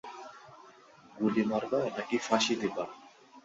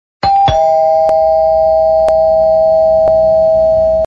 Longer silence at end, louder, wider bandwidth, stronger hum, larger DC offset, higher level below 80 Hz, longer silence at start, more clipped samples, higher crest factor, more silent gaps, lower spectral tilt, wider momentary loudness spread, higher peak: about the same, 0.05 s vs 0 s; second, -31 LUFS vs -10 LUFS; first, 8 kHz vs 7 kHz; neither; neither; second, -72 dBFS vs -32 dBFS; second, 0.05 s vs 0.25 s; neither; first, 20 dB vs 8 dB; neither; second, -4 dB/octave vs -6 dB/octave; first, 20 LU vs 1 LU; second, -12 dBFS vs 0 dBFS